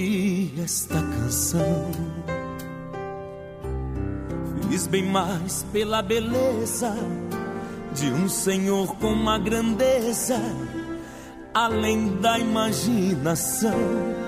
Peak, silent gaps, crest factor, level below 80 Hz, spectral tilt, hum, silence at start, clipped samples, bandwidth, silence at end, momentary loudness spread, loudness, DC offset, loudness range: -8 dBFS; none; 16 dB; -42 dBFS; -4.5 dB/octave; none; 0 s; under 0.1%; 15.5 kHz; 0 s; 11 LU; -25 LUFS; under 0.1%; 4 LU